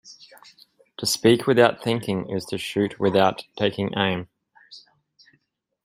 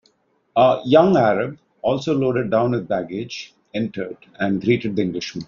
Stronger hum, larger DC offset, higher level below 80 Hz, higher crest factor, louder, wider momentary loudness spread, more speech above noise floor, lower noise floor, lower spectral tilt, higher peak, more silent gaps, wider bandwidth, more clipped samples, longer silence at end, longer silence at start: neither; neither; about the same, -62 dBFS vs -58 dBFS; about the same, 22 dB vs 18 dB; about the same, -22 LUFS vs -20 LUFS; second, 10 LU vs 15 LU; first, 48 dB vs 44 dB; first, -69 dBFS vs -63 dBFS; about the same, -4.5 dB/octave vs -5.5 dB/octave; about the same, -2 dBFS vs -2 dBFS; neither; first, 16 kHz vs 7.2 kHz; neither; first, 1.05 s vs 0.05 s; second, 0.05 s vs 0.55 s